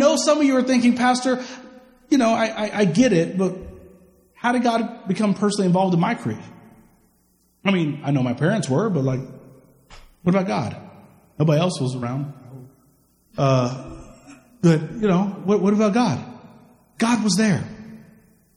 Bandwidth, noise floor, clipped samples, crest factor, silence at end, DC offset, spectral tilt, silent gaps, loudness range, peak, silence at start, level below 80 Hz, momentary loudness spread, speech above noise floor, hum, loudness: 12 kHz; -62 dBFS; under 0.1%; 18 dB; 0.6 s; under 0.1%; -6 dB/octave; none; 4 LU; -4 dBFS; 0 s; -54 dBFS; 17 LU; 43 dB; none; -21 LUFS